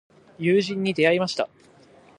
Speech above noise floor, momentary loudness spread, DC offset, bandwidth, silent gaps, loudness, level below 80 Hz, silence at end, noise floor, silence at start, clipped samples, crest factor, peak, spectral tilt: 31 dB; 9 LU; under 0.1%; 10.5 kHz; none; -23 LUFS; -68 dBFS; 0.7 s; -53 dBFS; 0.4 s; under 0.1%; 18 dB; -6 dBFS; -5.5 dB/octave